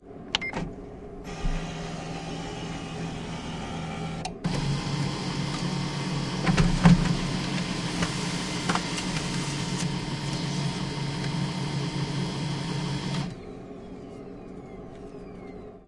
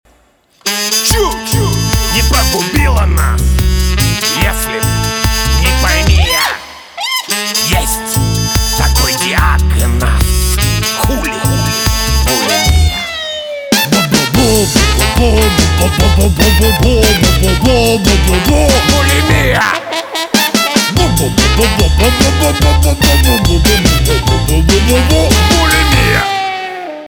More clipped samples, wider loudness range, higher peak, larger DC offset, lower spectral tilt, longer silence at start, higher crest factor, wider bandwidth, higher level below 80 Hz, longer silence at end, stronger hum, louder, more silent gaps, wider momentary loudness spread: neither; first, 9 LU vs 3 LU; second, -4 dBFS vs 0 dBFS; neither; about the same, -5 dB/octave vs -4 dB/octave; second, 0 s vs 0.65 s; first, 24 dB vs 10 dB; second, 11.5 kHz vs over 20 kHz; second, -40 dBFS vs -14 dBFS; about the same, 0 s vs 0 s; neither; second, -29 LUFS vs -10 LUFS; neither; first, 15 LU vs 5 LU